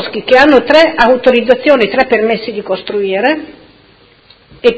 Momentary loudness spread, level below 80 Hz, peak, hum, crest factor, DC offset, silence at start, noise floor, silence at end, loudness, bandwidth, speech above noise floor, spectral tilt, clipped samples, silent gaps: 11 LU; -44 dBFS; 0 dBFS; none; 10 dB; under 0.1%; 0 s; -45 dBFS; 0 s; -10 LUFS; 8 kHz; 35 dB; -5 dB/octave; 1%; none